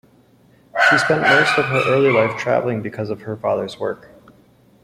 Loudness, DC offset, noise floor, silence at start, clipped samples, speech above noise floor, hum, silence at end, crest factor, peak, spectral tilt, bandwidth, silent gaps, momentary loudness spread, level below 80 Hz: -17 LUFS; under 0.1%; -53 dBFS; 0.75 s; under 0.1%; 35 dB; none; 0.9 s; 18 dB; 0 dBFS; -5 dB/octave; 15.5 kHz; none; 13 LU; -58 dBFS